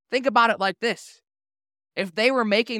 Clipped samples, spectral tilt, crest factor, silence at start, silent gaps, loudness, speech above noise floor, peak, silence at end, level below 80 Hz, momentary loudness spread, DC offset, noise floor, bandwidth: under 0.1%; -4 dB/octave; 18 dB; 0.1 s; none; -22 LUFS; over 68 dB; -6 dBFS; 0 s; -76 dBFS; 12 LU; under 0.1%; under -90 dBFS; 14.5 kHz